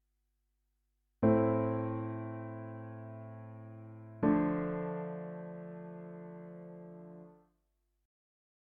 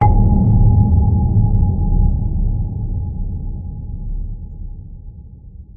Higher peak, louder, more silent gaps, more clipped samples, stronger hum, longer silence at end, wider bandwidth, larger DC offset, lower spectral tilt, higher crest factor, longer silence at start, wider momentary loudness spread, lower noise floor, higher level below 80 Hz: second, -16 dBFS vs -2 dBFS; second, -35 LUFS vs -17 LUFS; neither; neither; neither; first, 1.4 s vs 0.05 s; first, 3.6 kHz vs 2.2 kHz; neither; second, -10 dB/octave vs -13.5 dB/octave; first, 22 dB vs 14 dB; first, 1.2 s vs 0 s; about the same, 20 LU vs 21 LU; first, -80 dBFS vs -36 dBFS; second, -64 dBFS vs -18 dBFS